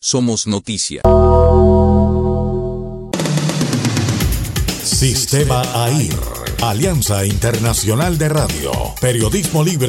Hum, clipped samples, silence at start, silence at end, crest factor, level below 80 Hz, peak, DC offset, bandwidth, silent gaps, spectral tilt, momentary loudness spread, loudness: none; under 0.1%; 0.05 s; 0 s; 14 dB; -26 dBFS; 0 dBFS; under 0.1%; 17 kHz; none; -5 dB/octave; 9 LU; -15 LUFS